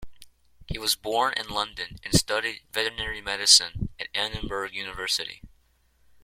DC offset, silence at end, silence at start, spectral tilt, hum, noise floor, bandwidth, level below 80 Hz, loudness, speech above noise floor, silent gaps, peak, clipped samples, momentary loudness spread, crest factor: under 0.1%; 0.75 s; 0 s; -1.5 dB/octave; none; -64 dBFS; 16.5 kHz; -46 dBFS; -25 LUFS; 37 dB; none; -2 dBFS; under 0.1%; 16 LU; 26 dB